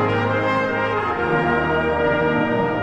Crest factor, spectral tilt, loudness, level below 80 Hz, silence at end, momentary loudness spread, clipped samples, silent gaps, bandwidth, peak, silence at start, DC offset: 14 dB; -7.5 dB/octave; -20 LUFS; -42 dBFS; 0 s; 2 LU; under 0.1%; none; 8.4 kHz; -6 dBFS; 0 s; under 0.1%